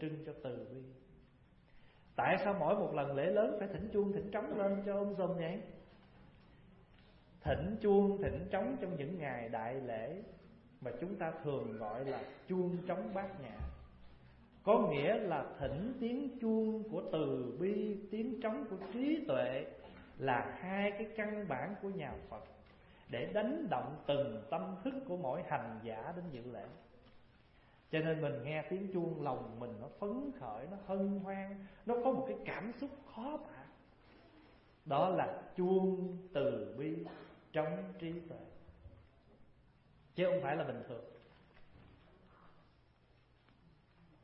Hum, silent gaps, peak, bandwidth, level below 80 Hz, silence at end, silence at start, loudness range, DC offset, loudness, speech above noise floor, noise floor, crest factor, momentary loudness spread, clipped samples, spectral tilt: none; none; -18 dBFS; 5.6 kHz; -62 dBFS; 1.65 s; 0 s; 6 LU; under 0.1%; -39 LUFS; 31 dB; -69 dBFS; 22 dB; 14 LU; under 0.1%; -6 dB/octave